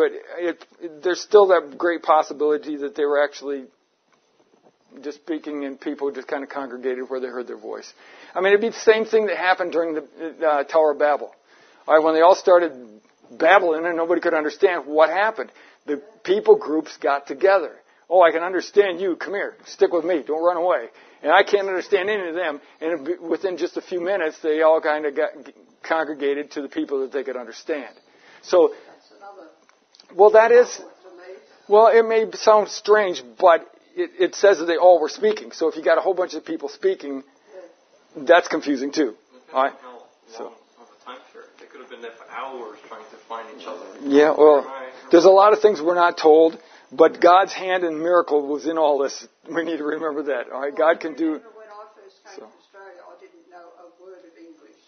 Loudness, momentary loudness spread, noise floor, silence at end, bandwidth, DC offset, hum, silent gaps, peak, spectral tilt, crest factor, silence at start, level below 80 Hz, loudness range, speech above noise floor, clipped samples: -19 LUFS; 19 LU; -64 dBFS; 0.75 s; 6.6 kHz; under 0.1%; none; none; 0 dBFS; -3.5 dB/octave; 20 dB; 0 s; -82 dBFS; 12 LU; 45 dB; under 0.1%